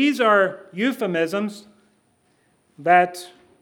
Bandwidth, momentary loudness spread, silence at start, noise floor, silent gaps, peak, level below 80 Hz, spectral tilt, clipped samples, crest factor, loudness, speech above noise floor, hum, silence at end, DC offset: 19 kHz; 11 LU; 0 s; -63 dBFS; none; -2 dBFS; -78 dBFS; -5 dB/octave; under 0.1%; 20 dB; -20 LUFS; 43 dB; none; 0.35 s; under 0.1%